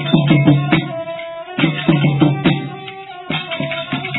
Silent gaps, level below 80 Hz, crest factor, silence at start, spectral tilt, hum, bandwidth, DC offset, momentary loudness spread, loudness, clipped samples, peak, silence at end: none; -46 dBFS; 16 dB; 0 s; -10 dB/octave; none; 4.1 kHz; under 0.1%; 15 LU; -16 LUFS; under 0.1%; 0 dBFS; 0 s